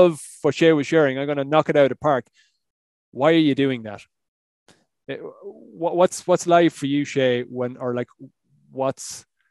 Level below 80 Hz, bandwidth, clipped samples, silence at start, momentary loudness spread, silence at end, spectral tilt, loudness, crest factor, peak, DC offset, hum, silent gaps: -68 dBFS; 12.5 kHz; under 0.1%; 0 s; 19 LU; 0.3 s; -5.5 dB/octave; -20 LUFS; 20 dB; -2 dBFS; under 0.1%; none; 2.70-3.12 s, 4.28-4.66 s